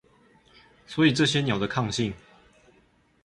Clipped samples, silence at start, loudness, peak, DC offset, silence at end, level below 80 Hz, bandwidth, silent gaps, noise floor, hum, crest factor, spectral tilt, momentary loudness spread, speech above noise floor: under 0.1%; 0.9 s; -25 LUFS; -8 dBFS; under 0.1%; 1.1 s; -56 dBFS; 11.5 kHz; none; -63 dBFS; none; 20 dB; -5 dB/octave; 13 LU; 39 dB